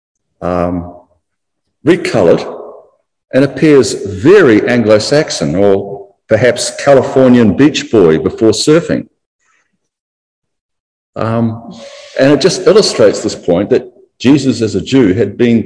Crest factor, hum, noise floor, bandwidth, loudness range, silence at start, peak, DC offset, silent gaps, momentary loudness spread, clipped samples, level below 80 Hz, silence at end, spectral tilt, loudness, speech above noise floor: 12 dB; none; -72 dBFS; 11 kHz; 6 LU; 0.4 s; 0 dBFS; under 0.1%; 9.26-9.39 s, 10.00-10.42 s, 10.61-10.69 s, 10.80-11.13 s; 12 LU; 2%; -44 dBFS; 0 s; -5.5 dB/octave; -10 LUFS; 63 dB